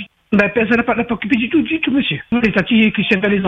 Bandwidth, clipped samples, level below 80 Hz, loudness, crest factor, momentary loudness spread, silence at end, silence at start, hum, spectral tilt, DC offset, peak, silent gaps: 6.6 kHz; under 0.1%; -46 dBFS; -15 LUFS; 16 dB; 5 LU; 0 s; 0 s; none; -7.5 dB/octave; under 0.1%; 0 dBFS; none